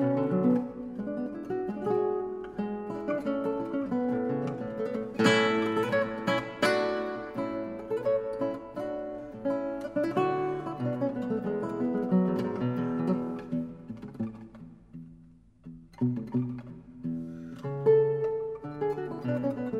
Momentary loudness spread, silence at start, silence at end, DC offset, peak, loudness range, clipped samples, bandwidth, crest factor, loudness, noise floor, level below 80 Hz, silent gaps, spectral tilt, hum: 12 LU; 0 s; 0 s; under 0.1%; -10 dBFS; 8 LU; under 0.1%; 13.5 kHz; 20 dB; -30 LUFS; -56 dBFS; -62 dBFS; none; -7 dB/octave; none